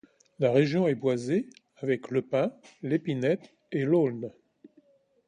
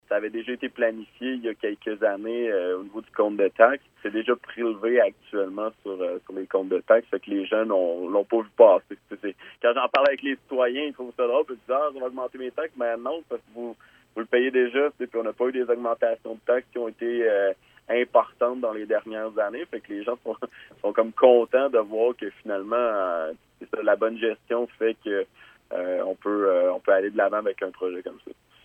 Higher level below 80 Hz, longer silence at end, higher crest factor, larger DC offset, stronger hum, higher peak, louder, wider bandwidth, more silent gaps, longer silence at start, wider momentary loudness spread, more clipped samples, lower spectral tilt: about the same, -72 dBFS vs -72 dBFS; first, 1 s vs 0.35 s; about the same, 20 dB vs 22 dB; neither; neither; second, -10 dBFS vs -2 dBFS; second, -28 LUFS vs -25 LUFS; first, 10 kHz vs 5.2 kHz; neither; first, 0.4 s vs 0.1 s; about the same, 12 LU vs 13 LU; neither; about the same, -7.5 dB/octave vs -6.5 dB/octave